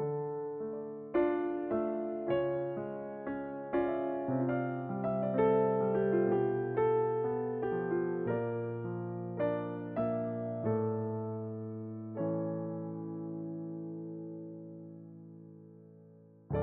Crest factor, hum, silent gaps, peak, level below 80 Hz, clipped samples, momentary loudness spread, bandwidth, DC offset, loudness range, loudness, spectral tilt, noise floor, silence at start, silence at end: 16 dB; none; none; -18 dBFS; -66 dBFS; under 0.1%; 13 LU; 3.8 kHz; under 0.1%; 9 LU; -35 LUFS; -8.5 dB/octave; -58 dBFS; 0 s; 0 s